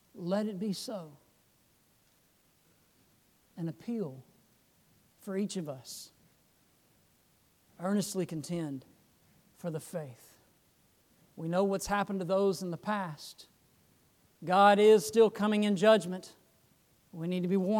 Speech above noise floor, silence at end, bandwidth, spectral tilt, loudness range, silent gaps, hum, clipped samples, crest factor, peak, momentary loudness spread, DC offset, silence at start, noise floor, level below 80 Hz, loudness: 39 dB; 0 s; 18 kHz; -5.5 dB/octave; 18 LU; none; none; under 0.1%; 20 dB; -12 dBFS; 21 LU; under 0.1%; 0.15 s; -69 dBFS; -68 dBFS; -30 LUFS